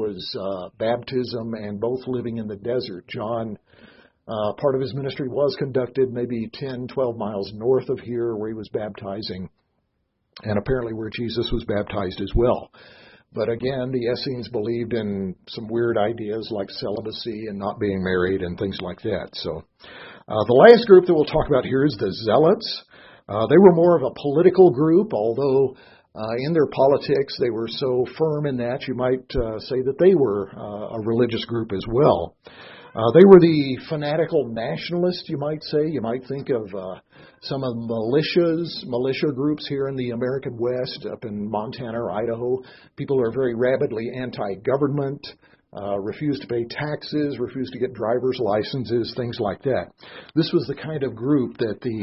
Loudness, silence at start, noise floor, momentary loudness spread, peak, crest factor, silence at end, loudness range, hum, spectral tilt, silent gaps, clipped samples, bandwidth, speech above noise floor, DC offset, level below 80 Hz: -22 LUFS; 0 s; -72 dBFS; 13 LU; 0 dBFS; 22 dB; 0 s; 10 LU; none; -10 dB/octave; none; under 0.1%; 5.8 kHz; 51 dB; under 0.1%; -46 dBFS